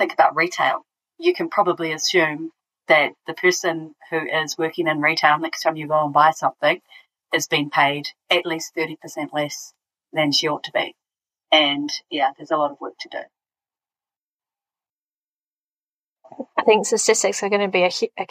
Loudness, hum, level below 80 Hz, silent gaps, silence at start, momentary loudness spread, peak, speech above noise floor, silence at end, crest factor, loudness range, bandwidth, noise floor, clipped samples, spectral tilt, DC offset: -20 LUFS; none; -80 dBFS; 14.22-14.27 s, 15.14-15.57 s, 15.64-15.98 s, 16.06-16.16 s; 0 s; 12 LU; -2 dBFS; over 69 dB; 0.05 s; 20 dB; 8 LU; 15 kHz; under -90 dBFS; under 0.1%; -2.5 dB/octave; under 0.1%